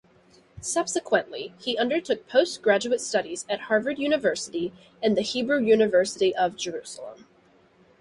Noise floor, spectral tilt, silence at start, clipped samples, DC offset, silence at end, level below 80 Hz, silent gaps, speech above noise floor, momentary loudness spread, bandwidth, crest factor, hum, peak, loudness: -59 dBFS; -3 dB/octave; 0.55 s; under 0.1%; under 0.1%; 0.85 s; -64 dBFS; none; 34 dB; 12 LU; 11.5 kHz; 20 dB; none; -6 dBFS; -25 LUFS